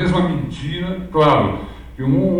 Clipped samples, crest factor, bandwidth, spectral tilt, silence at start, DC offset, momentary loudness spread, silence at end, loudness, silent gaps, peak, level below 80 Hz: under 0.1%; 16 dB; 10.5 kHz; -8 dB/octave; 0 s; under 0.1%; 11 LU; 0 s; -18 LUFS; none; -2 dBFS; -36 dBFS